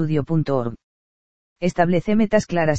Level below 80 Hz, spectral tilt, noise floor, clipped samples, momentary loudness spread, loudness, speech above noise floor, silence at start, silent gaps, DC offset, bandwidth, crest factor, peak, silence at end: -48 dBFS; -7 dB/octave; under -90 dBFS; under 0.1%; 7 LU; -20 LUFS; over 71 dB; 0 s; 0.83-1.56 s; 2%; 8.4 kHz; 18 dB; -2 dBFS; 0 s